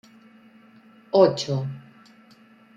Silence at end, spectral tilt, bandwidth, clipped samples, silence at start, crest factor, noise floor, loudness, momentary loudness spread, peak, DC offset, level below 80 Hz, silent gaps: 0.95 s; -6.5 dB/octave; 7.8 kHz; under 0.1%; 1.15 s; 22 dB; -53 dBFS; -22 LUFS; 17 LU; -4 dBFS; under 0.1%; -70 dBFS; none